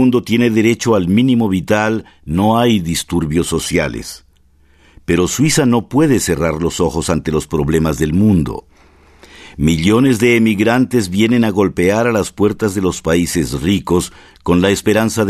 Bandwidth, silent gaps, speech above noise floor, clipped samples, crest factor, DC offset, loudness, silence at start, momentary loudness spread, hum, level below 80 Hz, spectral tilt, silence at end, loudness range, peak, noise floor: 14 kHz; none; 36 dB; under 0.1%; 14 dB; under 0.1%; -14 LUFS; 0 s; 6 LU; none; -36 dBFS; -5.5 dB/octave; 0 s; 3 LU; 0 dBFS; -50 dBFS